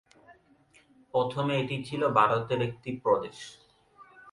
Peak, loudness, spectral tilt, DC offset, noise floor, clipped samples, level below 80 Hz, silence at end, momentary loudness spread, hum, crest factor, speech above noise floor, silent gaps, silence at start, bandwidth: -8 dBFS; -28 LUFS; -6.5 dB/octave; under 0.1%; -62 dBFS; under 0.1%; -66 dBFS; 0 s; 12 LU; none; 22 dB; 34 dB; none; 0.3 s; 11.5 kHz